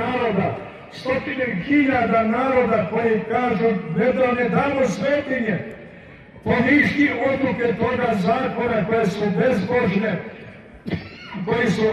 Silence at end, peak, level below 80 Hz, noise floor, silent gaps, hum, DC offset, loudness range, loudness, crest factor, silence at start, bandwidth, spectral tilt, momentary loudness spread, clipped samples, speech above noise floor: 0 s; -4 dBFS; -48 dBFS; -42 dBFS; none; none; under 0.1%; 2 LU; -20 LUFS; 16 dB; 0 s; 12 kHz; -7 dB/octave; 12 LU; under 0.1%; 23 dB